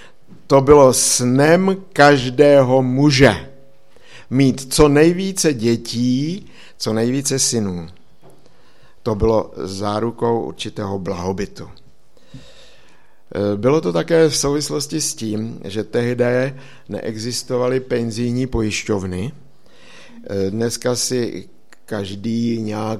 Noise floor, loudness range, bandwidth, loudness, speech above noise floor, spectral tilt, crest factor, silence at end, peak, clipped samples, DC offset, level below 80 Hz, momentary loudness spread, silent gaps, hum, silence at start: -54 dBFS; 10 LU; 15 kHz; -17 LUFS; 37 dB; -4.5 dB/octave; 18 dB; 0 s; 0 dBFS; under 0.1%; 1%; -40 dBFS; 15 LU; none; none; 0.5 s